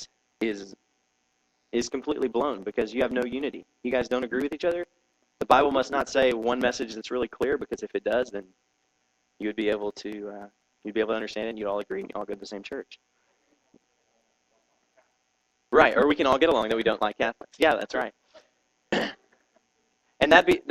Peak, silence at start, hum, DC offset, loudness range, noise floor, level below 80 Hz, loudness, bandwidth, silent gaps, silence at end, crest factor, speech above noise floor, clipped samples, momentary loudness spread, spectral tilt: 0 dBFS; 0 s; none; under 0.1%; 9 LU; -73 dBFS; -58 dBFS; -26 LUFS; 14 kHz; none; 0 s; 26 dB; 47 dB; under 0.1%; 16 LU; -4 dB/octave